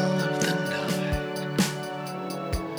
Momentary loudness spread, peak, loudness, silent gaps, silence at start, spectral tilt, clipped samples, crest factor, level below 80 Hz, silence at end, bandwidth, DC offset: 8 LU; -10 dBFS; -28 LUFS; none; 0 s; -5 dB/octave; under 0.1%; 18 dB; -42 dBFS; 0 s; over 20 kHz; under 0.1%